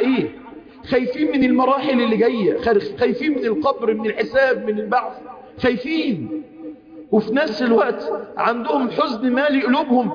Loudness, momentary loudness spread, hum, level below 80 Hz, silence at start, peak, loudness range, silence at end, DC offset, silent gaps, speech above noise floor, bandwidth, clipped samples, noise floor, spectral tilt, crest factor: -19 LUFS; 12 LU; none; -54 dBFS; 0 s; -6 dBFS; 3 LU; 0 s; under 0.1%; none; 21 dB; 5.2 kHz; under 0.1%; -39 dBFS; -7 dB/octave; 14 dB